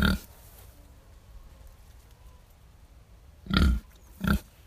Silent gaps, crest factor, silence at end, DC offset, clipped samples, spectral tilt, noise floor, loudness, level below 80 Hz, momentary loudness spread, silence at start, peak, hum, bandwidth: none; 26 dB; 0.25 s; under 0.1%; under 0.1%; -6 dB/octave; -54 dBFS; -28 LUFS; -36 dBFS; 28 LU; 0 s; -6 dBFS; none; 15.5 kHz